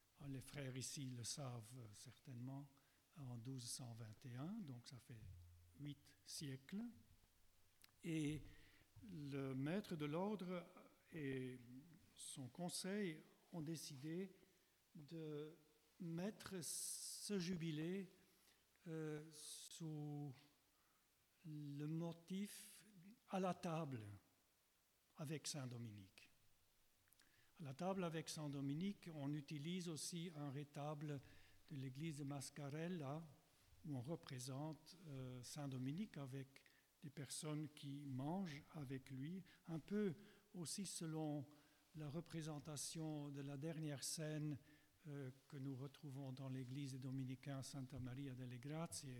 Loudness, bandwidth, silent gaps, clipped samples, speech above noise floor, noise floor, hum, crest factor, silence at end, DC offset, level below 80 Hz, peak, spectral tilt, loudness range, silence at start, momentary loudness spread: -51 LUFS; 19 kHz; none; under 0.1%; 31 dB; -82 dBFS; none; 18 dB; 0 s; under 0.1%; -80 dBFS; -34 dBFS; -5 dB/octave; 5 LU; 0.15 s; 13 LU